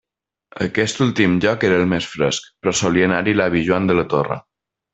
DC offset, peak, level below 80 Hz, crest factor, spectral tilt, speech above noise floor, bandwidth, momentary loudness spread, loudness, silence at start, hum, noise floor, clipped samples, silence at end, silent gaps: under 0.1%; -2 dBFS; -50 dBFS; 16 dB; -5 dB/octave; 35 dB; 8.4 kHz; 6 LU; -18 LUFS; 0.55 s; none; -52 dBFS; under 0.1%; 0.55 s; none